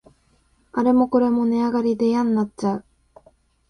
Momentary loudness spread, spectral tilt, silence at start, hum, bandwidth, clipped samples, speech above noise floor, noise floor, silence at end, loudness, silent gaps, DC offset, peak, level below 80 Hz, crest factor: 8 LU; -7.5 dB/octave; 0.75 s; none; 10 kHz; under 0.1%; 42 dB; -61 dBFS; 0.9 s; -21 LUFS; none; under 0.1%; -6 dBFS; -58 dBFS; 16 dB